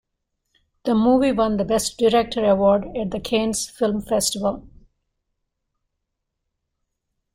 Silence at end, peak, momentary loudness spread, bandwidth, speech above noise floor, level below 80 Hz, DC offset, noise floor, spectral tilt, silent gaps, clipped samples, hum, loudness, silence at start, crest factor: 2.65 s; -6 dBFS; 9 LU; 16.5 kHz; 59 dB; -48 dBFS; under 0.1%; -79 dBFS; -4.5 dB/octave; none; under 0.1%; none; -20 LUFS; 0.85 s; 16 dB